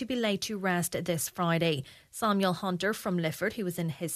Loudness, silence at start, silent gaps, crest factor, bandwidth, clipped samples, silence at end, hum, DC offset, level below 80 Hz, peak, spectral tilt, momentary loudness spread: -30 LUFS; 0 s; none; 18 dB; 14 kHz; under 0.1%; 0 s; none; under 0.1%; -66 dBFS; -14 dBFS; -4.5 dB/octave; 6 LU